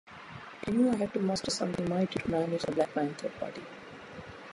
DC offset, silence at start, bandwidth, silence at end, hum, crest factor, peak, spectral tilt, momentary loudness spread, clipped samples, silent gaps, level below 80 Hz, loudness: under 0.1%; 0.05 s; 11.5 kHz; 0 s; none; 18 dB; -14 dBFS; -5.5 dB/octave; 18 LU; under 0.1%; none; -62 dBFS; -31 LUFS